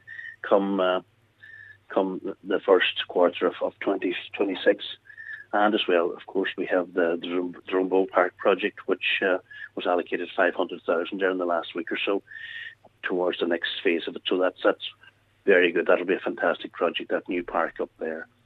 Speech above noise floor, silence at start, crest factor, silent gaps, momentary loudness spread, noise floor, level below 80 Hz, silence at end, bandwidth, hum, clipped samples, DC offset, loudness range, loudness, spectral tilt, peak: 24 dB; 0.1 s; 22 dB; none; 12 LU; -50 dBFS; -72 dBFS; 0.2 s; 4.7 kHz; none; under 0.1%; under 0.1%; 3 LU; -25 LUFS; -6.5 dB/octave; -4 dBFS